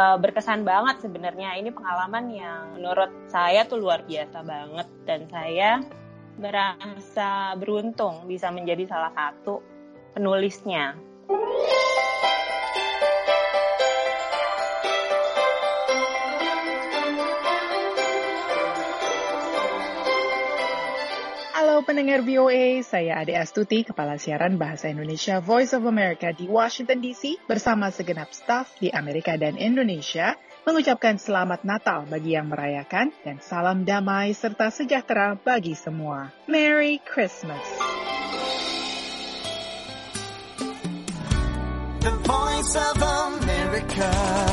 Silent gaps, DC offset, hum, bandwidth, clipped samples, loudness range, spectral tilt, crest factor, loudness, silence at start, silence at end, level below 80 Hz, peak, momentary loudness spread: none; under 0.1%; none; 11.5 kHz; under 0.1%; 5 LU; -4.5 dB/octave; 18 dB; -24 LUFS; 0 s; 0 s; -40 dBFS; -6 dBFS; 10 LU